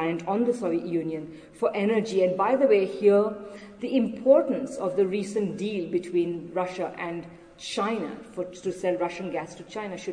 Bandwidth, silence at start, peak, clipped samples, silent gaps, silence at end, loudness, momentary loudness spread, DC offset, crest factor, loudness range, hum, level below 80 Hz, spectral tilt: 10 kHz; 0 s; -6 dBFS; under 0.1%; none; 0 s; -26 LUFS; 15 LU; under 0.1%; 20 dB; 7 LU; none; -64 dBFS; -6 dB/octave